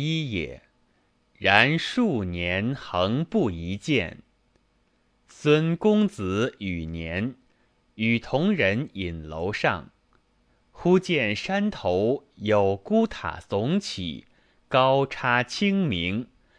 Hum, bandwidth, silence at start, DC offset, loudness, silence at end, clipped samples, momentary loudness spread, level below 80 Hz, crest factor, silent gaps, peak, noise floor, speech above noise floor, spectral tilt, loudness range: none; 10.5 kHz; 0 s; under 0.1%; -25 LUFS; 0.35 s; under 0.1%; 11 LU; -52 dBFS; 24 dB; none; 0 dBFS; -67 dBFS; 42 dB; -6 dB/octave; 3 LU